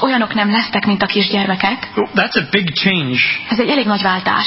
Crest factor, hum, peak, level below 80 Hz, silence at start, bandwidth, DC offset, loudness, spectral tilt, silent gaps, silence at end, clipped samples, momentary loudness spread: 16 dB; none; 0 dBFS; -52 dBFS; 0 s; 5.8 kHz; under 0.1%; -15 LUFS; -8.5 dB/octave; none; 0 s; under 0.1%; 2 LU